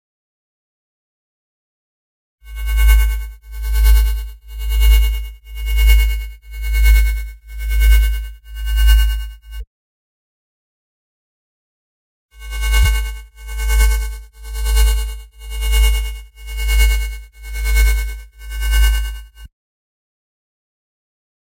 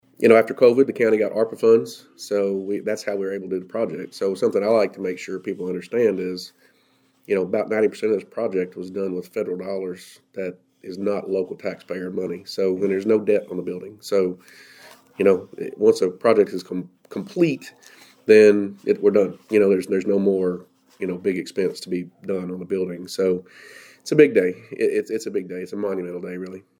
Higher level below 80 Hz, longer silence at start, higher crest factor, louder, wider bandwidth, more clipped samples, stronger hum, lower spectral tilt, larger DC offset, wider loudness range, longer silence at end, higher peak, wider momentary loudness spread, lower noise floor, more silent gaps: first, -18 dBFS vs -76 dBFS; first, 2.45 s vs 0.2 s; about the same, 16 dB vs 20 dB; first, -18 LUFS vs -22 LUFS; first, 16.5 kHz vs 14 kHz; neither; neither; second, -2.5 dB/octave vs -6 dB/octave; neither; about the same, 6 LU vs 7 LU; first, 2.15 s vs 0.2 s; about the same, 0 dBFS vs 0 dBFS; first, 18 LU vs 15 LU; first, under -90 dBFS vs -62 dBFS; first, 9.67-12.29 s vs none